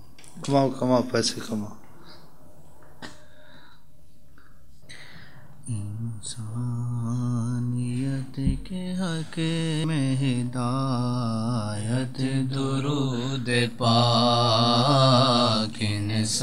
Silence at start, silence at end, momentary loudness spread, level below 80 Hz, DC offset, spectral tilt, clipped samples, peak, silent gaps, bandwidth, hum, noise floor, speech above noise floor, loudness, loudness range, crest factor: 0.25 s; 0 s; 14 LU; -48 dBFS; 1%; -5.5 dB/octave; under 0.1%; -6 dBFS; none; 13 kHz; none; -56 dBFS; 33 dB; -25 LUFS; 16 LU; 20 dB